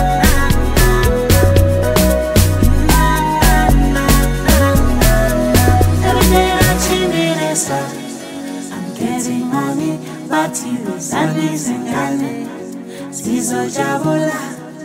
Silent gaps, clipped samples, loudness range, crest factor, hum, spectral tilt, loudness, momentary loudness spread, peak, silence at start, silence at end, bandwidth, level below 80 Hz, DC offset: none; under 0.1%; 7 LU; 14 dB; none; -5 dB/octave; -15 LUFS; 13 LU; 0 dBFS; 0 s; 0 s; 16.5 kHz; -20 dBFS; under 0.1%